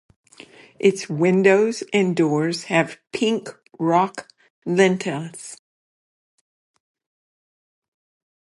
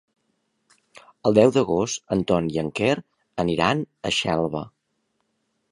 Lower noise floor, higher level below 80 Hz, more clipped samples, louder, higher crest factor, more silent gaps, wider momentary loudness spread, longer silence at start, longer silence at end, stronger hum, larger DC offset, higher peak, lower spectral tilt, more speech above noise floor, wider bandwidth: second, -47 dBFS vs -73 dBFS; second, -72 dBFS vs -52 dBFS; neither; first, -20 LUFS vs -23 LUFS; about the same, 20 dB vs 22 dB; first, 4.50-4.62 s vs none; first, 18 LU vs 11 LU; second, 0.8 s vs 1.25 s; first, 2.85 s vs 1.05 s; neither; neither; about the same, -2 dBFS vs -2 dBFS; about the same, -5.5 dB/octave vs -5 dB/octave; second, 27 dB vs 52 dB; about the same, 11.5 kHz vs 11.5 kHz